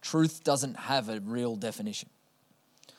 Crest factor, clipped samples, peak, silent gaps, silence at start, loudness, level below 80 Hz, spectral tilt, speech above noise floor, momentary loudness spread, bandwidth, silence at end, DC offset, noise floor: 18 dB; under 0.1%; -14 dBFS; none; 0 s; -31 LUFS; -82 dBFS; -4.5 dB/octave; 37 dB; 10 LU; 16 kHz; 0.95 s; under 0.1%; -68 dBFS